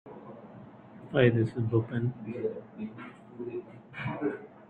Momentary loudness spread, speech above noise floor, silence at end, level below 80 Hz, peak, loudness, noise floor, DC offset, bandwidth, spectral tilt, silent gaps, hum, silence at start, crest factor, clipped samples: 23 LU; 19 dB; 0.05 s; -66 dBFS; -10 dBFS; -31 LUFS; -50 dBFS; under 0.1%; 4.7 kHz; -9.5 dB/octave; none; none; 0.05 s; 22 dB; under 0.1%